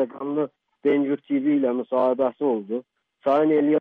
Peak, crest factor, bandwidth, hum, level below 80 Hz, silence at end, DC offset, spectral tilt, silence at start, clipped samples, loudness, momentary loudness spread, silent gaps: -10 dBFS; 12 dB; 4.2 kHz; none; -72 dBFS; 0 s; under 0.1%; -9 dB/octave; 0 s; under 0.1%; -23 LUFS; 9 LU; none